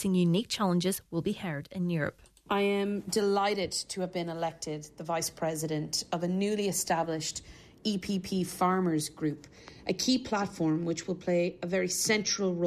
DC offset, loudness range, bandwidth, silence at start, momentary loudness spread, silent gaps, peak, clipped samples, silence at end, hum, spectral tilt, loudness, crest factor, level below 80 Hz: under 0.1%; 2 LU; 14 kHz; 0 s; 9 LU; none; -14 dBFS; under 0.1%; 0 s; none; -4.5 dB/octave; -31 LUFS; 16 dB; -62 dBFS